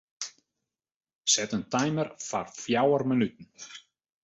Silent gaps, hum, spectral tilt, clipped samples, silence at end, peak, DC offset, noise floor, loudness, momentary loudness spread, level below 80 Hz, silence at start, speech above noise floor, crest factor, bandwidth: 0.96-1.01 s, 1.15-1.24 s; none; -3.5 dB/octave; under 0.1%; 0.45 s; -8 dBFS; under 0.1%; -87 dBFS; -27 LUFS; 20 LU; -68 dBFS; 0.2 s; 58 dB; 22 dB; 8.4 kHz